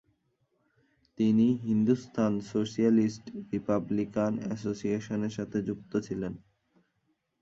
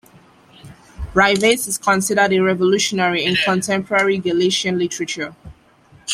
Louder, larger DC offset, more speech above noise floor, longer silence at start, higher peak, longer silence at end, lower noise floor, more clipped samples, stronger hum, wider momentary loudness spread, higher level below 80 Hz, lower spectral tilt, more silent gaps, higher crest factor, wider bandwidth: second, -30 LUFS vs -17 LUFS; neither; first, 48 dB vs 33 dB; first, 1.2 s vs 0.65 s; second, -14 dBFS vs -2 dBFS; first, 1.05 s vs 0 s; first, -76 dBFS vs -50 dBFS; neither; neither; about the same, 10 LU vs 9 LU; second, -64 dBFS vs -44 dBFS; first, -7.5 dB/octave vs -3.5 dB/octave; neither; about the same, 16 dB vs 18 dB; second, 7.6 kHz vs 15 kHz